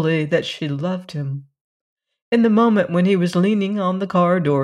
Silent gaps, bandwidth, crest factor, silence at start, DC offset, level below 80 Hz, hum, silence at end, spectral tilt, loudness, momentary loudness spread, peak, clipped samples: 1.61-1.96 s, 2.22-2.32 s; 11.5 kHz; 14 dB; 0 s; under 0.1%; -66 dBFS; none; 0 s; -7.5 dB/octave; -19 LUFS; 11 LU; -4 dBFS; under 0.1%